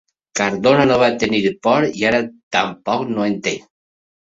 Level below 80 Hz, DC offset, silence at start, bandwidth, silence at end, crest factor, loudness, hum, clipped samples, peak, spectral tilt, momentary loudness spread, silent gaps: -52 dBFS; under 0.1%; 0.35 s; 8 kHz; 0.75 s; 16 dB; -17 LUFS; none; under 0.1%; -2 dBFS; -4.5 dB/octave; 8 LU; 2.43-2.51 s